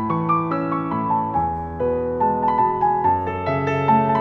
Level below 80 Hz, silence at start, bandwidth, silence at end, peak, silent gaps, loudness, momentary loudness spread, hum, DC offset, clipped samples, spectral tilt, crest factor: -46 dBFS; 0 s; 6.2 kHz; 0 s; -6 dBFS; none; -21 LUFS; 5 LU; none; under 0.1%; under 0.1%; -9 dB/octave; 14 dB